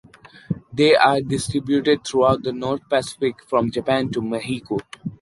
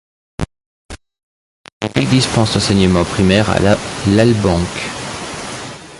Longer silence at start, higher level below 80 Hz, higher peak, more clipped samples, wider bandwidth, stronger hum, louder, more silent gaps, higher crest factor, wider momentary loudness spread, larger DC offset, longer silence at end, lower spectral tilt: about the same, 0.5 s vs 0.4 s; second, -52 dBFS vs -34 dBFS; about the same, -2 dBFS vs 0 dBFS; neither; about the same, 11.5 kHz vs 11.5 kHz; neither; second, -21 LUFS vs -15 LUFS; second, none vs 0.66-0.89 s, 1.23-1.64 s, 1.72-1.81 s; about the same, 18 dB vs 16 dB; second, 12 LU vs 15 LU; neither; about the same, 0.05 s vs 0 s; about the same, -5 dB/octave vs -5.5 dB/octave